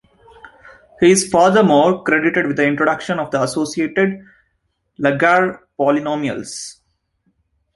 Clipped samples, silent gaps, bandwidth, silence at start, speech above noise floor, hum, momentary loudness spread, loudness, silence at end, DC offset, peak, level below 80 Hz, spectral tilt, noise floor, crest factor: under 0.1%; none; 11.5 kHz; 0.45 s; 53 dB; none; 11 LU; -16 LUFS; 1.05 s; under 0.1%; -2 dBFS; -56 dBFS; -4.5 dB/octave; -68 dBFS; 16 dB